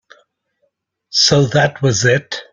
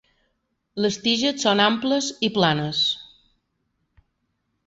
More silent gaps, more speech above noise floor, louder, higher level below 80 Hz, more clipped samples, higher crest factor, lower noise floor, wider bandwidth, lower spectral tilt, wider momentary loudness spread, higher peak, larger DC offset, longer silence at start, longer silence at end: neither; about the same, 53 dB vs 52 dB; first, -14 LUFS vs -21 LUFS; first, -48 dBFS vs -62 dBFS; neither; about the same, 16 dB vs 20 dB; second, -67 dBFS vs -74 dBFS; first, 9.4 kHz vs 8 kHz; about the same, -4 dB/octave vs -4 dB/octave; about the same, 6 LU vs 7 LU; first, 0 dBFS vs -4 dBFS; neither; first, 1.15 s vs 0.75 s; second, 0.1 s vs 1.6 s